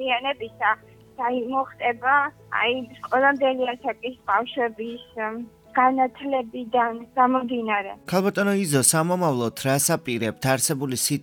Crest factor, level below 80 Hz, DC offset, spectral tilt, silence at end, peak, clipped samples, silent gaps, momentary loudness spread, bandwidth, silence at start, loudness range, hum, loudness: 18 dB; -64 dBFS; under 0.1%; -3.5 dB/octave; 0 s; -4 dBFS; under 0.1%; none; 10 LU; 19.5 kHz; 0 s; 3 LU; none; -23 LUFS